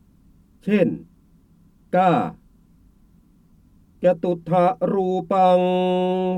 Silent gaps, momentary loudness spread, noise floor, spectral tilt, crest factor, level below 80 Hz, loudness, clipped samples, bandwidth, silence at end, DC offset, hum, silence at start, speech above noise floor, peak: none; 7 LU; -55 dBFS; -8.5 dB/octave; 18 dB; -58 dBFS; -20 LUFS; under 0.1%; 9 kHz; 0 s; under 0.1%; none; 0.65 s; 36 dB; -4 dBFS